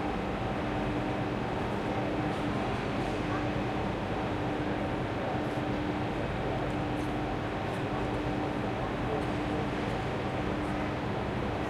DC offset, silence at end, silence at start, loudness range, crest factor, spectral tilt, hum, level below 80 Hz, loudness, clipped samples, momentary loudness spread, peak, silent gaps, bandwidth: under 0.1%; 0 s; 0 s; 1 LU; 12 dB; -7 dB/octave; none; -44 dBFS; -32 LUFS; under 0.1%; 1 LU; -18 dBFS; none; 13 kHz